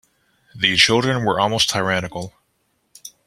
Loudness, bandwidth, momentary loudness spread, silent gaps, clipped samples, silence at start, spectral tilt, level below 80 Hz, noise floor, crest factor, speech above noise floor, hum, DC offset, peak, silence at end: -17 LUFS; 15.5 kHz; 16 LU; none; under 0.1%; 0.55 s; -3 dB/octave; -52 dBFS; -68 dBFS; 20 dB; 49 dB; none; under 0.1%; 0 dBFS; 0.15 s